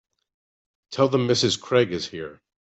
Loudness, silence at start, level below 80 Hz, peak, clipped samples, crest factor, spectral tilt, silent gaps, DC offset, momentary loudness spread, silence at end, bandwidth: -22 LUFS; 0.9 s; -64 dBFS; -6 dBFS; under 0.1%; 18 dB; -4.5 dB/octave; none; under 0.1%; 15 LU; 0.3 s; 8.4 kHz